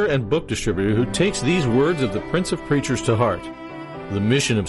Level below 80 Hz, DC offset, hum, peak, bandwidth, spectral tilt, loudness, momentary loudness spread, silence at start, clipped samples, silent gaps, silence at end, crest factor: -42 dBFS; under 0.1%; none; -8 dBFS; 11.5 kHz; -5.5 dB/octave; -21 LUFS; 10 LU; 0 s; under 0.1%; none; 0 s; 14 dB